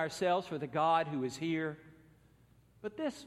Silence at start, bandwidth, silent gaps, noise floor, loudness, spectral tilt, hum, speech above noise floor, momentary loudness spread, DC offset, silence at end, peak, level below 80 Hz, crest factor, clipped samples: 0 s; 13.5 kHz; none; -65 dBFS; -34 LUFS; -5.5 dB/octave; none; 31 dB; 15 LU; under 0.1%; 0 s; -18 dBFS; -72 dBFS; 18 dB; under 0.1%